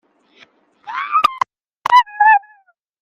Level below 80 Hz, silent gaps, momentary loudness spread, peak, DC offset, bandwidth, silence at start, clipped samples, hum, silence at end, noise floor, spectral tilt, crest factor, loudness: -62 dBFS; 1.77-1.81 s; 14 LU; 0 dBFS; under 0.1%; 15 kHz; 0.85 s; under 0.1%; none; 0.65 s; -55 dBFS; -0.5 dB/octave; 16 dB; -15 LUFS